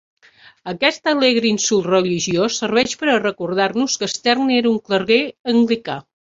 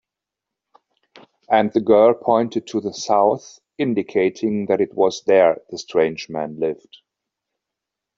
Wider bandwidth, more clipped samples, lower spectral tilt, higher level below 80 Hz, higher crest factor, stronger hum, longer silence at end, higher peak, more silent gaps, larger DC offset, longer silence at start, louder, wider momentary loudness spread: about the same, 7.8 kHz vs 7.6 kHz; neither; second, -3.5 dB/octave vs -5.5 dB/octave; first, -58 dBFS vs -64 dBFS; about the same, 16 dB vs 18 dB; neither; second, 0.2 s vs 1.45 s; about the same, -2 dBFS vs -2 dBFS; first, 5.40-5.44 s vs none; neither; second, 0.65 s vs 1.5 s; about the same, -17 LUFS vs -19 LUFS; second, 4 LU vs 11 LU